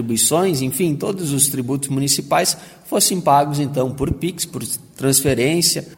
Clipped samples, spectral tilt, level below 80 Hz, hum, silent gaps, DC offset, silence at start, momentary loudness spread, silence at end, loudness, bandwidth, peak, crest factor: under 0.1%; -3.5 dB/octave; -44 dBFS; none; none; under 0.1%; 0 s; 8 LU; 0.05 s; -18 LUFS; 16.5 kHz; -2 dBFS; 16 dB